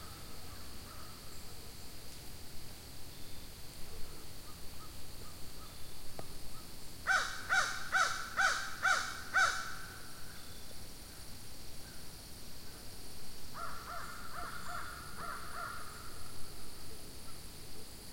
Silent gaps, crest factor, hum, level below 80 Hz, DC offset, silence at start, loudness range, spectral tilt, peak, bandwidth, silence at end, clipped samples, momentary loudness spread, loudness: none; 20 dB; none; -54 dBFS; 0.5%; 0 s; 16 LU; -1.5 dB/octave; -18 dBFS; 16.5 kHz; 0 s; under 0.1%; 17 LU; -40 LUFS